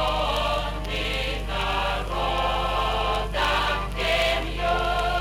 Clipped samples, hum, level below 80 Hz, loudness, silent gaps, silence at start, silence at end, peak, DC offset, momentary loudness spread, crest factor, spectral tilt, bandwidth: under 0.1%; 50 Hz at -30 dBFS; -32 dBFS; -25 LUFS; none; 0 s; 0 s; -12 dBFS; under 0.1%; 5 LU; 14 dB; -4 dB/octave; 16 kHz